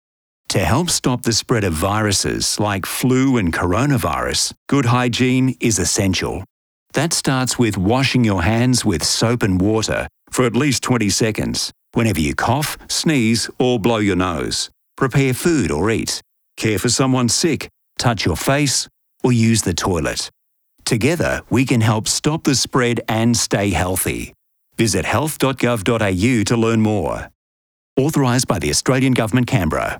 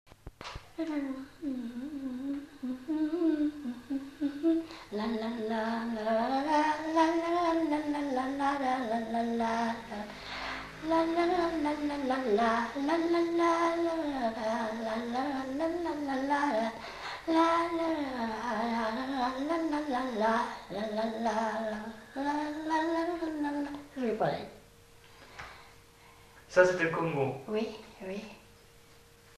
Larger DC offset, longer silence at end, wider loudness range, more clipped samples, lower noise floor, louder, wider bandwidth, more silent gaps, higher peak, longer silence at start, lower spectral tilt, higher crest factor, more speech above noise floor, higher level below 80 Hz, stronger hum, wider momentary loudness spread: neither; second, 0 s vs 0.45 s; second, 2 LU vs 5 LU; neither; about the same, -58 dBFS vs -58 dBFS; first, -17 LUFS vs -32 LUFS; first, over 20 kHz vs 13.5 kHz; first, 4.57-4.66 s, 6.50-6.86 s, 27.35-27.96 s vs none; first, -2 dBFS vs -10 dBFS; first, 0.5 s vs 0.25 s; about the same, -4.5 dB/octave vs -5.5 dB/octave; second, 16 dB vs 22 dB; first, 41 dB vs 26 dB; first, -42 dBFS vs -60 dBFS; neither; second, 7 LU vs 12 LU